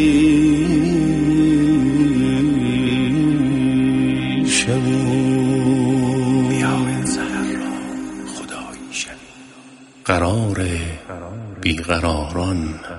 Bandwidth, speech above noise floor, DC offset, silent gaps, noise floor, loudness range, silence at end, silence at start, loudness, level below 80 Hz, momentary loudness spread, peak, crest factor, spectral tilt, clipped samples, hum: 11.5 kHz; 25 dB; under 0.1%; none; -43 dBFS; 8 LU; 0 s; 0 s; -18 LUFS; -38 dBFS; 14 LU; -2 dBFS; 16 dB; -5.5 dB/octave; under 0.1%; none